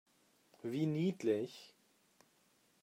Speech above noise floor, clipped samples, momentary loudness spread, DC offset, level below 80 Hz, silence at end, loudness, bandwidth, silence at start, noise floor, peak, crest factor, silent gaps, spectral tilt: 36 dB; under 0.1%; 13 LU; under 0.1%; -84 dBFS; 1.15 s; -38 LUFS; 16 kHz; 0.65 s; -73 dBFS; -22 dBFS; 18 dB; none; -7.5 dB/octave